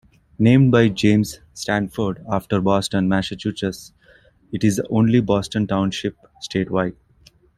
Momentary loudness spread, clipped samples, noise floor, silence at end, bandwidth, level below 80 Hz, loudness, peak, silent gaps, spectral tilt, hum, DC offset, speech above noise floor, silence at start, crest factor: 12 LU; under 0.1%; -54 dBFS; 0.65 s; 14 kHz; -48 dBFS; -20 LUFS; -2 dBFS; none; -6.5 dB/octave; none; under 0.1%; 35 dB; 0.4 s; 18 dB